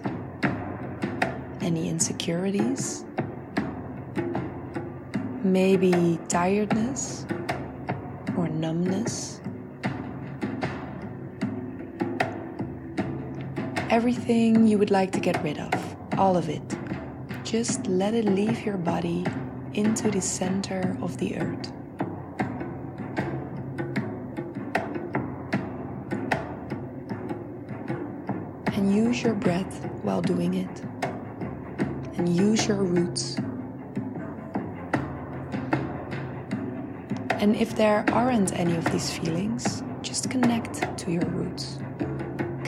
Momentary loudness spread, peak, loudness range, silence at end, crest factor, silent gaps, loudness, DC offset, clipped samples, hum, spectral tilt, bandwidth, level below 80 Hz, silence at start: 12 LU; -8 dBFS; 8 LU; 0 s; 20 dB; none; -28 LUFS; under 0.1%; under 0.1%; none; -5.5 dB/octave; 13.5 kHz; -56 dBFS; 0 s